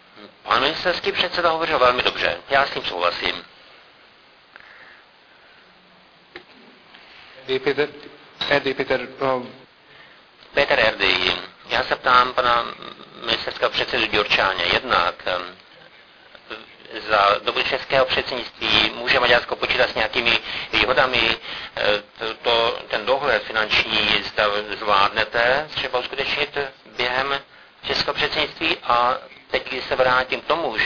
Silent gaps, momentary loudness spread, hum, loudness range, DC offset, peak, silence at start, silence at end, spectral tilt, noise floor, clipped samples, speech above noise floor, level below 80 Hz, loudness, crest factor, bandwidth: none; 10 LU; none; 7 LU; under 0.1%; 0 dBFS; 0.15 s; 0 s; -4 dB/octave; -52 dBFS; under 0.1%; 31 dB; -50 dBFS; -20 LUFS; 22 dB; 5.4 kHz